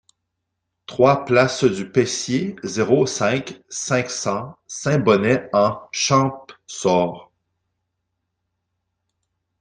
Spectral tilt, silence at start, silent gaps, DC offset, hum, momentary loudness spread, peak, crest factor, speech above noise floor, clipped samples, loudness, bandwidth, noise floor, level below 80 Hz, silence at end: -4.5 dB/octave; 0.9 s; none; under 0.1%; none; 12 LU; -2 dBFS; 20 dB; 59 dB; under 0.1%; -20 LUFS; 10 kHz; -78 dBFS; -60 dBFS; 2.4 s